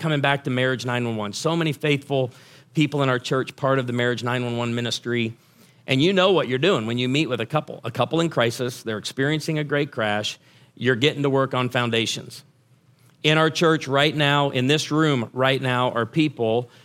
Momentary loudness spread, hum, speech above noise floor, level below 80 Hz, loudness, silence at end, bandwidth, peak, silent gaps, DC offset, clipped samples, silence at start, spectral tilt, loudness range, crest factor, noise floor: 7 LU; none; 36 dB; -66 dBFS; -22 LUFS; 0.2 s; 16 kHz; 0 dBFS; none; under 0.1%; under 0.1%; 0 s; -5 dB/octave; 3 LU; 22 dB; -58 dBFS